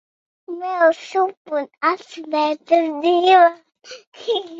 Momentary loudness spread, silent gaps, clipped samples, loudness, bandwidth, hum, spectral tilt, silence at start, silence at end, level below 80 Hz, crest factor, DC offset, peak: 15 LU; 1.37-1.45 s, 4.07-4.12 s; under 0.1%; -18 LUFS; 7.6 kHz; none; -2.5 dB/octave; 0.5 s; 0 s; -74 dBFS; 16 dB; under 0.1%; -2 dBFS